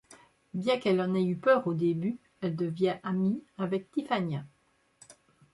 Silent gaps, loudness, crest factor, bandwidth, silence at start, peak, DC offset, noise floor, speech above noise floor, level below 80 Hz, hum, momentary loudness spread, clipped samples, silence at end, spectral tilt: none; -30 LUFS; 20 dB; 11.5 kHz; 0.1 s; -10 dBFS; under 0.1%; -67 dBFS; 38 dB; -72 dBFS; none; 10 LU; under 0.1%; 0.4 s; -7.5 dB/octave